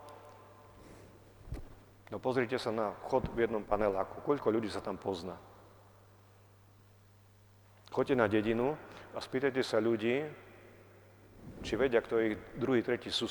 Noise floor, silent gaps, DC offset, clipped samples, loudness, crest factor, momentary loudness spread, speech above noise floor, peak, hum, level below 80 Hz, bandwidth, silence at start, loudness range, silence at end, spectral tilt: -61 dBFS; none; under 0.1%; under 0.1%; -34 LUFS; 24 dB; 22 LU; 28 dB; -12 dBFS; 50 Hz at -60 dBFS; -58 dBFS; 19 kHz; 0 s; 6 LU; 0 s; -6 dB/octave